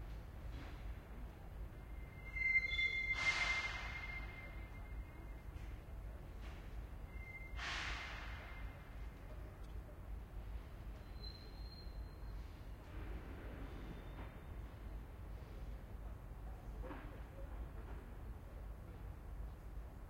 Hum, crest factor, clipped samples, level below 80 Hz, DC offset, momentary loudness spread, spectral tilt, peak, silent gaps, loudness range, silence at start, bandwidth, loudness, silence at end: none; 22 dB; under 0.1%; -52 dBFS; under 0.1%; 17 LU; -4 dB/octave; -26 dBFS; none; 14 LU; 0 s; 16 kHz; -46 LUFS; 0 s